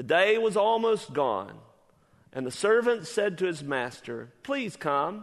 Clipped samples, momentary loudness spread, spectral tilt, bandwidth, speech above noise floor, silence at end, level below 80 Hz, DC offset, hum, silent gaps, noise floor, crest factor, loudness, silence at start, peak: under 0.1%; 15 LU; -4.5 dB/octave; 12 kHz; 35 dB; 0 s; -72 dBFS; under 0.1%; none; none; -62 dBFS; 18 dB; -27 LUFS; 0 s; -8 dBFS